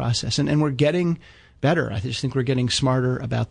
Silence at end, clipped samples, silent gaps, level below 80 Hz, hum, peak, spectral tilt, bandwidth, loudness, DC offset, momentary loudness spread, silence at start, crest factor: 0.05 s; under 0.1%; none; -48 dBFS; none; -8 dBFS; -5.5 dB/octave; 10 kHz; -22 LUFS; under 0.1%; 6 LU; 0 s; 14 dB